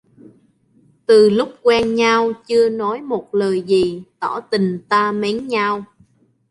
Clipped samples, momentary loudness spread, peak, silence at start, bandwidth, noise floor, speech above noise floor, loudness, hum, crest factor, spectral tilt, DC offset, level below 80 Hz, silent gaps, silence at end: under 0.1%; 11 LU; -2 dBFS; 1.1 s; 11.5 kHz; -56 dBFS; 39 dB; -17 LUFS; none; 16 dB; -5.5 dB/octave; under 0.1%; -56 dBFS; none; 0.65 s